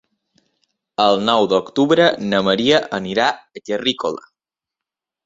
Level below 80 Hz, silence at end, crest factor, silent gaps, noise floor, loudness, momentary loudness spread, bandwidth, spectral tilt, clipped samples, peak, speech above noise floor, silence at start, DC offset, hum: -58 dBFS; 1.1 s; 18 dB; none; -86 dBFS; -17 LUFS; 11 LU; 7.8 kHz; -5 dB/octave; under 0.1%; -2 dBFS; 69 dB; 1 s; under 0.1%; none